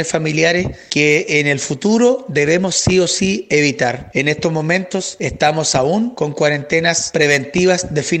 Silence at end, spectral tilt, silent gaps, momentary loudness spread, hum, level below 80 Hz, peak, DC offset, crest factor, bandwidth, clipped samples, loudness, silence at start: 0 s; -4 dB/octave; none; 5 LU; none; -44 dBFS; 0 dBFS; under 0.1%; 14 dB; 11 kHz; under 0.1%; -15 LUFS; 0 s